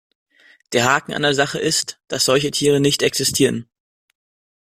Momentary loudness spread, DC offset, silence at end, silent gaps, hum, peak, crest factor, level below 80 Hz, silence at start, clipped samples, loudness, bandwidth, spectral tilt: 4 LU; under 0.1%; 1 s; none; none; -2 dBFS; 18 dB; -56 dBFS; 0.7 s; under 0.1%; -18 LUFS; 16 kHz; -3 dB/octave